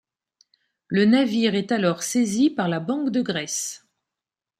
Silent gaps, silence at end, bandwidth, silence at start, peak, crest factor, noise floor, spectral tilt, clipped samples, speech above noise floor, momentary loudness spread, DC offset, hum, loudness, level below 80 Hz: none; 0.85 s; 15 kHz; 0.9 s; -6 dBFS; 18 dB; -88 dBFS; -4.5 dB/octave; under 0.1%; 67 dB; 9 LU; under 0.1%; none; -22 LUFS; -68 dBFS